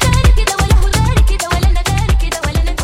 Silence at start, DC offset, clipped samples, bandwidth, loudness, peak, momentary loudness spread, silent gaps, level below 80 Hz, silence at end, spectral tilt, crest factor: 0 s; under 0.1%; under 0.1%; 16 kHz; -14 LUFS; -2 dBFS; 5 LU; none; -14 dBFS; 0 s; -4.5 dB/octave; 10 dB